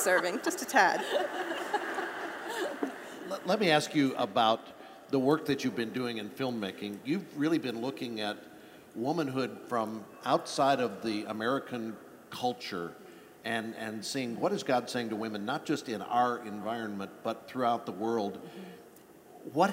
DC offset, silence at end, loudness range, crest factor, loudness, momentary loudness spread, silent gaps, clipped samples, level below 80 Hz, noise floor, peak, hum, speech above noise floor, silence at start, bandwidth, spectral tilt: under 0.1%; 0 s; 5 LU; 22 dB; -32 LUFS; 15 LU; none; under 0.1%; -78 dBFS; -55 dBFS; -10 dBFS; none; 23 dB; 0 s; 16 kHz; -4.5 dB/octave